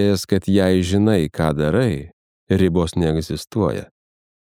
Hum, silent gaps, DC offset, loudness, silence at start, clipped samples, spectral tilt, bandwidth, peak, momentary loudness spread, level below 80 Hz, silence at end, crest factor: none; 2.13-2.47 s; under 0.1%; -19 LUFS; 0 s; under 0.1%; -6.5 dB/octave; 16 kHz; -2 dBFS; 7 LU; -40 dBFS; 0.6 s; 16 dB